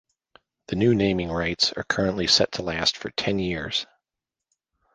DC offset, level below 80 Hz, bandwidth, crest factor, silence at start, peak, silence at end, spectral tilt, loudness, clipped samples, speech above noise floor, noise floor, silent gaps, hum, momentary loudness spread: under 0.1%; -48 dBFS; 10 kHz; 20 dB; 0.7 s; -6 dBFS; 1.1 s; -4 dB/octave; -23 LUFS; under 0.1%; 64 dB; -88 dBFS; none; none; 9 LU